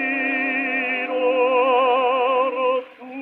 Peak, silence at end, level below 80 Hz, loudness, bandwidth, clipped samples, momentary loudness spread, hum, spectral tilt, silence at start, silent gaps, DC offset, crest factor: -8 dBFS; 0 s; -82 dBFS; -20 LUFS; 4.3 kHz; under 0.1%; 5 LU; none; -5 dB/octave; 0 s; none; under 0.1%; 12 dB